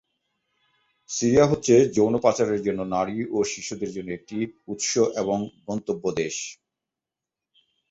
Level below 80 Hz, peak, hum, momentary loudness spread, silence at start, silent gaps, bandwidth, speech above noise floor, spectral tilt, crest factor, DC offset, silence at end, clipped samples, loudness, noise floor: -56 dBFS; -6 dBFS; none; 13 LU; 1.1 s; none; 8.2 kHz; 65 dB; -5 dB/octave; 20 dB; under 0.1%; 1.4 s; under 0.1%; -24 LUFS; -88 dBFS